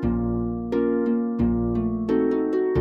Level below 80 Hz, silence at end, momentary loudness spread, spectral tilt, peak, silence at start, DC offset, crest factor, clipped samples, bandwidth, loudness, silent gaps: -38 dBFS; 0 s; 3 LU; -10.5 dB/octave; -10 dBFS; 0 s; under 0.1%; 12 dB; under 0.1%; 5.4 kHz; -24 LUFS; none